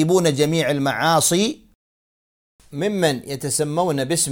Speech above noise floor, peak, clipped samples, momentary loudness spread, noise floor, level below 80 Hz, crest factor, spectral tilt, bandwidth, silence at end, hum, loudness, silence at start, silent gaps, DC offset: over 71 dB; -4 dBFS; under 0.1%; 9 LU; under -90 dBFS; -56 dBFS; 18 dB; -4 dB/octave; 17.5 kHz; 0 s; none; -20 LUFS; 0 s; 1.75-2.59 s; under 0.1%